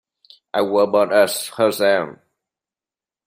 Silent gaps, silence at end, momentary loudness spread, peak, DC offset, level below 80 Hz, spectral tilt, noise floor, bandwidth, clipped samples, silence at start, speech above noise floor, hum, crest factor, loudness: none; 1.1 s; 8 LU; -2 dBFS; under 0.1%; -68 dBFS; -3.5 dB/octave; under -90 dBFS; 16 kHz; under 0.1%; 0.55 s; over 73 dB; none; 18 dB; -18 LUFS